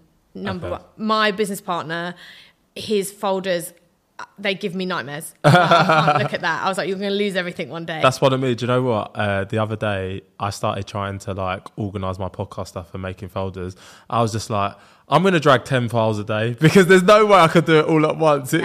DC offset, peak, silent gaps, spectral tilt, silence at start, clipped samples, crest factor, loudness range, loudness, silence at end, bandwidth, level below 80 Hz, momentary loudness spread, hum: under 0.1%; -2 dBFS; none; -5.5 dB/octave; 0.35 s; under 0.1%; 16 dB; 11 LU; -19 LUFS; 0 s; 15.5 kHz; -56 dBFS; 17 LU; none